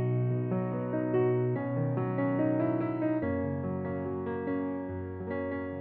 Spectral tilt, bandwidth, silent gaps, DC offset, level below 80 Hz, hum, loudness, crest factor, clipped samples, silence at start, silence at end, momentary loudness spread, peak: -9.5 dB/octave; 3.6 kHz; none; under 0.1%; -64 dBFS; none; -31 LUFS; 14 dB; under 0.1%; 0 s; 0 s; 7 LU; -18 dBFS